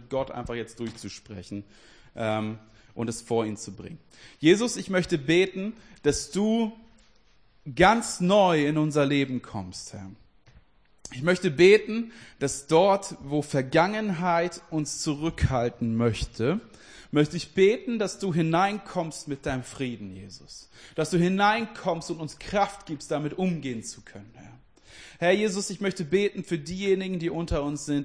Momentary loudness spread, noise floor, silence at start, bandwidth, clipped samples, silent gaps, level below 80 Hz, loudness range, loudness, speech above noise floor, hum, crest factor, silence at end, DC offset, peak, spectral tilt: 18 LU; -62 dBFS; 0 s; 10.5 kHz; under 0.1%; none; -48 dBFS; 6 LU; -26 LUFS; 36 dB; none; 22 dB; 0 s; under 0.1%; -6 dBFS; -5 dB/octave